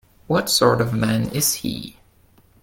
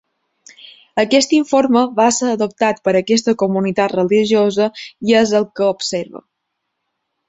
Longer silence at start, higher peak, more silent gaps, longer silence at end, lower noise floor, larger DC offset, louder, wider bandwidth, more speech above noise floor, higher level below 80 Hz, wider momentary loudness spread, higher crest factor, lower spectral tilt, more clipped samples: second, 0.3 s vs 0.95 s; about the same, -2 dBFS vs -2 dBFS; neither; second, 0.7 s vs 1.1 s; second, -55 dBFS vs -75 dBFS; neither; second, -19 LUFS vs -16 LUFS; first, 17 kHz vs 8.2 kHz; second, 35 dB vs 59 dB; first, -48 dBFS vs -58 dBFS; first, 13 LU vs 8 LU; about the same, 20 dB vs 16 dB; about the same, -4 dB/octave vs -4 dB/octave; neither